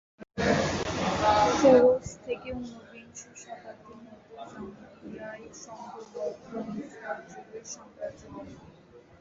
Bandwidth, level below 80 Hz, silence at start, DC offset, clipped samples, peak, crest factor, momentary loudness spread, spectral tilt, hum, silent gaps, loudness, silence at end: 7.8 kHz; -52 dBFS; 0.2 s; under 0.1%; under 0.1%; -8 dBFS; 22 dB; 24 LU; -5 dB/octave; none; none; -26 LUFS; 0.2 s